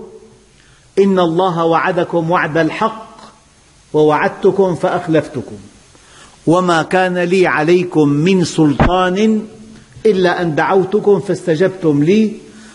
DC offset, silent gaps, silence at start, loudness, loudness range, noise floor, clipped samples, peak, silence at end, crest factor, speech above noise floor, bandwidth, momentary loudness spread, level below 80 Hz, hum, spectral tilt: under 0.1%; none; 0 s; -14 LUFS; 3 LU; -47 dBFS; under 0.1%; -2 dBFS; 0.05 s; 12 dB; 35 dB; 11.5 kHz; 7 LU; -36 dBFS; none; -6.5 dB/octave